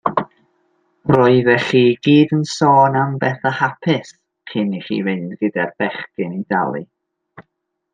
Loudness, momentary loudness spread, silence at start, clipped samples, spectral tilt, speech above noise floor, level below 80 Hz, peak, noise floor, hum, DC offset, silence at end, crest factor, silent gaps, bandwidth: -17 LUFS; 12 LU; 0.05 s; under 0.1%; -6.5 dB/octave; 57 dB; -58 dBFS; -2 dBFS; -73 dBFS; none; under 0.1%; 0.55 s; 16 dB; none; 9.4 kHz